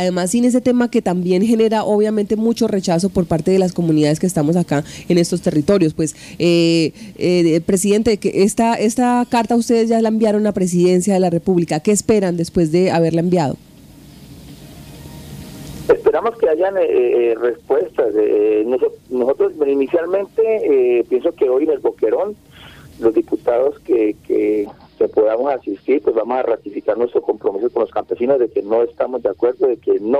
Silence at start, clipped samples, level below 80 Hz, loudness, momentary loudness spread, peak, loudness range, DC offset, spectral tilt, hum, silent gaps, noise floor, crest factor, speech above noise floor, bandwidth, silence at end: 0 s; under 0.1%; -48 dBFS; -16 LUFS; 6 LU; -2 dBFS; 3 LU; under 0.1%; -6 dB/octave; none; none; -41 dBFS; 14 dB; 25 dB; 15 kHz; 0 s